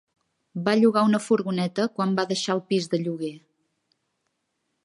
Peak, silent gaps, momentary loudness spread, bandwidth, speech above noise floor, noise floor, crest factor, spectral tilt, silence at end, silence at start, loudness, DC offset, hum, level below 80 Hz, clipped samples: -8 dBFS; none; 11 LU; 11.5 kHz; 53 dB; -77 dBFS; 18 dB; -5.5 dB/octave; 1.45 s; 0.55 s; -24 LUFS; under 0.1%; none; -74 dBFS; under 0.1%